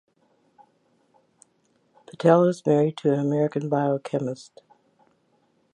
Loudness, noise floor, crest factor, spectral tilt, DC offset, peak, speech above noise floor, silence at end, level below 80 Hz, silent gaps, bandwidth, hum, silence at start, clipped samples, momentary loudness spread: -23 LUFS; -67 dBFS; 22 dB; -8 dB/octave; under 0.1%; -4 dBFS; 44 dB; 1.35 s; -76 dBFS; none; 11 kHz; none; 2.2 s; under 0.1%; 10 LU